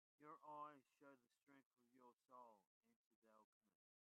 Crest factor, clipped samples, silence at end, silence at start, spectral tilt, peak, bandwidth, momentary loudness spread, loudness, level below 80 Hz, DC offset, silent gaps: 22 dB; under 0.1%; 0.4 s; 0.2 s; -1 dB/octave; -46 dBFS; 3.9 kHz; 9 LU; -63 LUFS; under -90 dBFS; under 0.1%; 1.43-1.47 s, 1.66-1.71 s, 2.13-2.17 s, 2.67-2.81 s, 2.96-3.22 s, 3.44-3.61 s